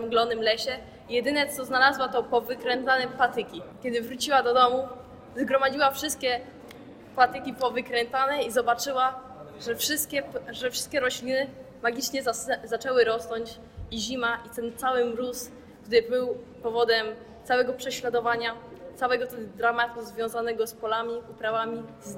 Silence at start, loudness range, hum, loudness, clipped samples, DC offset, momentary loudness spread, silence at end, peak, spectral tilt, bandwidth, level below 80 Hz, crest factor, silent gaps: 0 s; 3 LU; none; -27 LUFS; under 0.1%; under 0.1%; 13 LU; 0 s; -6 dBFS; -2.5 dB/octave; 16.5 kHz; -60 dBFS; 20 dB; none